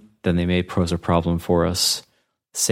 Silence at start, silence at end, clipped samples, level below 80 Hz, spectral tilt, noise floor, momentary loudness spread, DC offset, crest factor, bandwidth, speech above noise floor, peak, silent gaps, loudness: 0.25 s; 0 s; under 0.1%; -40 dBFS; -4.5 dB/octave; -42 dBFS; 5 LU; under 0.1%; 18 dB; 16.5 kHz; 22 dB; -4 dBFS; none; -21 LUFS